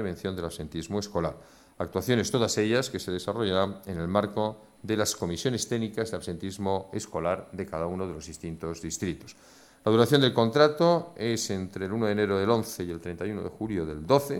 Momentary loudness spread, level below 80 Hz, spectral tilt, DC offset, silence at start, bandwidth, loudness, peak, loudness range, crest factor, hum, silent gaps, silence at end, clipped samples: 13 LU; -54 dBFS; -5 dB/octave; under 0.1%; 0 s; 17.5 kHz; -28 LUFS; -6 dBFS; 8 LU; 22 dB; none; none; 0 s; under 0.1%